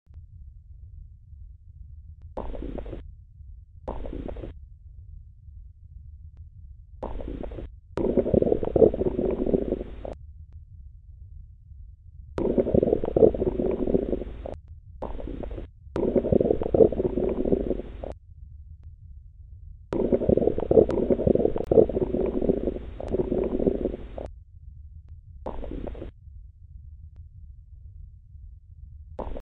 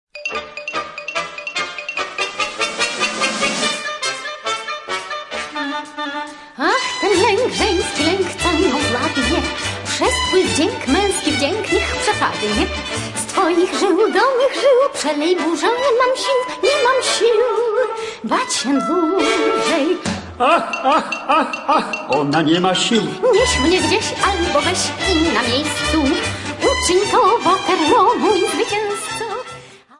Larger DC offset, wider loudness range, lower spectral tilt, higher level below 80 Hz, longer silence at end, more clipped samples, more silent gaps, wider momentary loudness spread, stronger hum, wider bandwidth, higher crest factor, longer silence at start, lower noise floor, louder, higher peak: neither; first, 19 LU vs 4 LU; first, -11 dB/octave vs -3 dB/octave; about the same, -40 dBFS vs -40 dBFS; second, 0 s vs 0.25 s; neither; neither; first, 27 LU vs 9 LU; neither; second, 4.7 kHz vs 11.5 kHz; first, 24 dB vs 16 dB; about the same, 0.15 s vs 0.15 s; first, -46 dBFS vs -38 dBFS; second, -25 LUFS vs -17 LUFS; about the same, -2 dBFS vs -2 dBFS